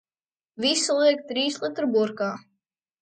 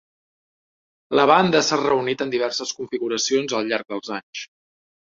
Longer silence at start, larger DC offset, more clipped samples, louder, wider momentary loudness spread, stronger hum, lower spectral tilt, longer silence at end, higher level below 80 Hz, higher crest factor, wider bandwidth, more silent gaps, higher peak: second, 0.6 s vs 1.1 s; neither; neither; second, -24 LUFS vs -21 LUFS; second, 10 LU vs 15 LU; neither; about the same, -2.5 dB/octave vs -3.5 dB/octave; about the same, 0.6 s vs 0.7 s; second, -76 dBFS vs -64 dBFS; about the same, 18 dB vs 22 dB; first, 9.4 kHz vs 7.6 kHz; second, none vs 4.23-4.33 s; second, -8 dBFS vs -2 dBFS